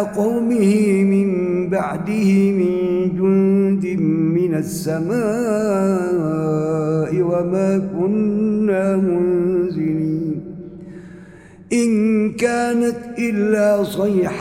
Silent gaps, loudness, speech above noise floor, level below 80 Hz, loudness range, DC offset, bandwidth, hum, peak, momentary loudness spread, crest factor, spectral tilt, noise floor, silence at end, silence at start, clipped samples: none; -18 LUFS; 24 dB; -52 dBFS; 4 LU; under 0.1%; 15 kHz; none; -4 dBFS; 7 LU; 14 dB; -7.5 dB/octave; -41 dBFS; 0 s; 0 s; under 0.1%